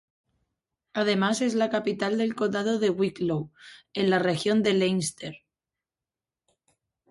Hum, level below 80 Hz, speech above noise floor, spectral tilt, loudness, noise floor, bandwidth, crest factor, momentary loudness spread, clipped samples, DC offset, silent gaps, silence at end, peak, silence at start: none; -68 dBFS; over 64 dB; -5 dB/octave; -26 LUFS; under -90 dBFS; 11.5 kHz; 18 dB; 10 LU; under 0.1%; under 0.1%; none; 1.75 s; -10 dBFS; 0.95 s